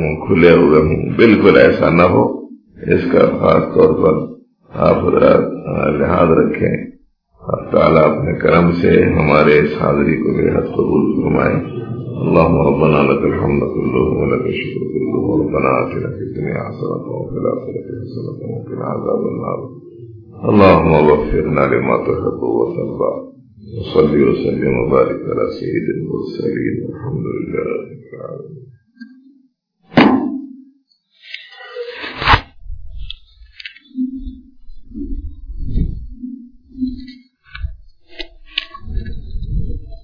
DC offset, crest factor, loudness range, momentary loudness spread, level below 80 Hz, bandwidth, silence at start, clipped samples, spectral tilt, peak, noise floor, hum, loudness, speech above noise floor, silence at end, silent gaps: under 0.1%; 16 dB; 15 LU; 21 LU; -32 dBFS; 5.4 kHz; 0 s; under 0.1%; -9.5 dB/octave; 0 dBFS; -57 dBFS; none; -15 LUFS; 43 dB; 0.1 s; none